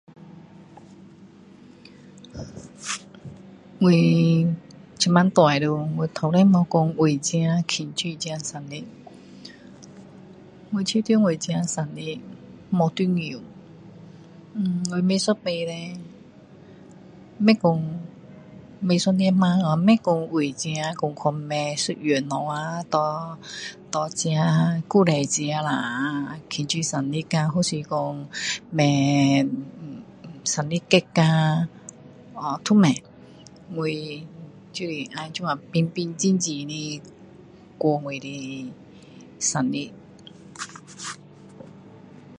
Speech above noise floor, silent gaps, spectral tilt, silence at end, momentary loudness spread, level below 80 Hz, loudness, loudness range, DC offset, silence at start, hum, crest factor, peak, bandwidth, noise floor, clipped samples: 26 dB; none; -5.5 dB/octave; 0 s; 19 LU; -62 dBFS; -23 LUFS; 8 LU; under 0.1%; 0.2 s; none; 24 dB; 0 dBFS; 11 kHz; -48 dBFS; under 0.1%